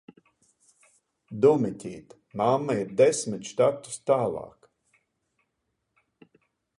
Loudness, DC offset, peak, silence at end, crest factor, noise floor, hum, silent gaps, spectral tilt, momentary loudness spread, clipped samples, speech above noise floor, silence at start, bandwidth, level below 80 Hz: -25 LUFS; under 0.1%; -8 dBFS; 2.3 s; 20 dB; -79 dBFS; none; none; -5.5 dB/octave; 19 LU; under 0.1%; 54 dB; 1.3 s; 11.5 kHz; -68 dBFS